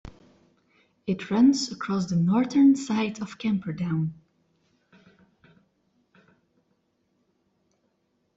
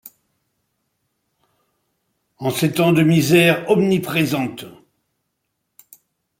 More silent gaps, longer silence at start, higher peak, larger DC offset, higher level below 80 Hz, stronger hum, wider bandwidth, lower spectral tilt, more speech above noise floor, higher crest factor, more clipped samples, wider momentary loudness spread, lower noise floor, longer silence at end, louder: neither; about the same, 0.05 s vs 0.05 s; second, -10 dBFS vs -2 dBFS; neither; about the same, -62 dBFS vs -60 dBFS; neither; second, 8 kHz vs 16.5 kHz; about the same, -6 dB/octave vs -5.5 dB/octave; second, 49 dB vs 58 dB; about the same, 18 dB vs 18 dB; neither; about the same, 12 LU vs 12 LU; about the same, -72 dBFS vs -75 dBFS; first, 4.25 s vs 1.7 s; second, -24 LUFS vs -17 LUFS